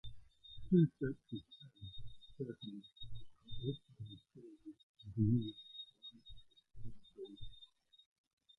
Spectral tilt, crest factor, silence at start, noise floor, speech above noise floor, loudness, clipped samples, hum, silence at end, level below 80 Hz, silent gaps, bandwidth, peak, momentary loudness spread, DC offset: -9.5 dB/octave; 22 dB; 0.05 s; -65 dBFS; 26 dB; -40 LUFS; under 0.1%; none; 0.95 s; -62 dBFS; 4.83-4.95 s; 4.1 kHz; -20 dBFS; 24 LU; under 0.1%